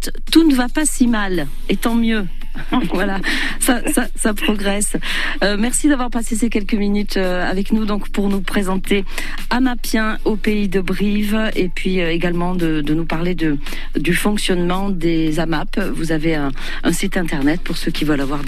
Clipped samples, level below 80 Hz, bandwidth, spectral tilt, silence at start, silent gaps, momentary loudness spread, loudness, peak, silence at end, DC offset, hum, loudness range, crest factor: under 0.1%; -22 dBFS; 14 kHz; -4.5 dB/octave; 0 s; none; 6 LU; -19 LUFS; 0 dBFS; 0 s; under 0.1%; none; 2 LU; 16 dB